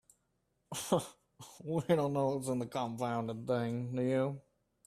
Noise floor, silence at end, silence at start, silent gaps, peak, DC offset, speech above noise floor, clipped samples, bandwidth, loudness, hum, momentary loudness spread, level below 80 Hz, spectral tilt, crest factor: -79 dBFS; 0.45 s; 0.7 s; none; -16 dBFS; under 0.1%; 45 dB; under 0.1%; 15 kHz; -35 LUFS; none; 17 LU; -72 dBFS; -6 dB/octave; 20 dB